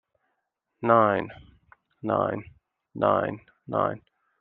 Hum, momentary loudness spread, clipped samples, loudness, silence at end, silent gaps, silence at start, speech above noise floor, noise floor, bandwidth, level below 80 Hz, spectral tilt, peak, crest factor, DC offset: none; 20 LU; under 0.1%; -25 LUFS; 0.45 s; none; 0.8 s; 55 dB; -79 dBFS; 4.2 kHz; -64 dBFS; -10 dB/octave; -4 dBFS; 24 dB; under 0.1%